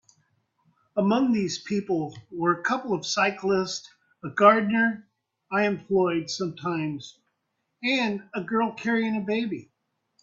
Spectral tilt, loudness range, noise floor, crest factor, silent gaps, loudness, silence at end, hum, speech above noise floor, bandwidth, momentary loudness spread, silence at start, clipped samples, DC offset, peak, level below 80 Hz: -5 dB/octave; 4 LU; -78 dBFS; 24 dB; none; -25 LUFS; 0.6 s; none; 53 dB; 7.8 kHz; 11 LU; 0.95 s; under 0.1%; under 0.1%; -2 dBFS; -68 dBFS